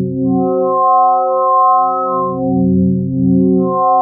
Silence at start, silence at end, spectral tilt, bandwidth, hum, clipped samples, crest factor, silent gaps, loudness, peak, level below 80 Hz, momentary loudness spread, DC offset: 0 s; 0 s; -18.5 dB/octave; 1.4 kHz; none; under 0.1%; 10 dB; none; -13 LUFS; -2 dBFS; -48 dBFS; 5 LU; under 0.1%